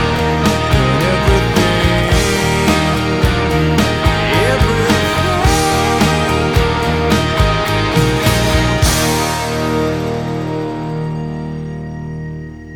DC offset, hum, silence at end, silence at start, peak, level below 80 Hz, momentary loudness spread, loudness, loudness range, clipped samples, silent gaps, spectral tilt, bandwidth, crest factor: under 0.1%; none; 0 s; 0 s; 0 dBFS; -22 dBFS; 9 LU; -14 LUFS; 4 LU; under 0.1%; none; -5 dB/octave; over 20 kHz; 14 dB